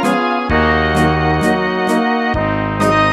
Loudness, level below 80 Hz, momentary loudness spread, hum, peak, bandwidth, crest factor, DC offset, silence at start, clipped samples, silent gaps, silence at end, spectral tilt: -15 LUFS; -28 dBFS; 3 LU; none; 0 dBFS; 14.5 kHz; 14 dB; under 0.1%; 0 s; under 0.1%; none; 0 s; -6 dB/octave